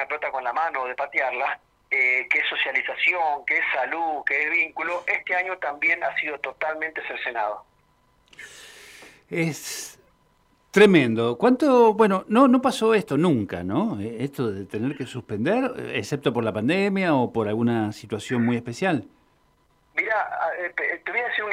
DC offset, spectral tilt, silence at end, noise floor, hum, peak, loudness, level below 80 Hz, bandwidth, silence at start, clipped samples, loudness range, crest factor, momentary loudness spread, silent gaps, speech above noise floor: under 0.1%; -5.5 dB/octave; 0 s; -63 dBFS; none; -4 dBFS; -23 LUFS; -66 dBFS; 15.5 kHz; 0 s; under 0.1%; 10 LU; 20 dB; 11 LU; none; 40 dB